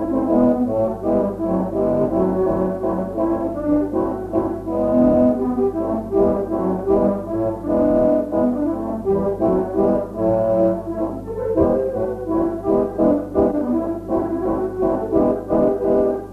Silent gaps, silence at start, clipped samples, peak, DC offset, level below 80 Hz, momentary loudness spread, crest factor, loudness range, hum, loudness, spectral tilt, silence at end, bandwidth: none; 0 s; under 0.1%; -4 dBFS; under 0.1%; -40 dBFS; 6 LU; 14 dB; 1 LU; none; -19 LUFS; -10.5 dB/octave; 0 s; 13 kHz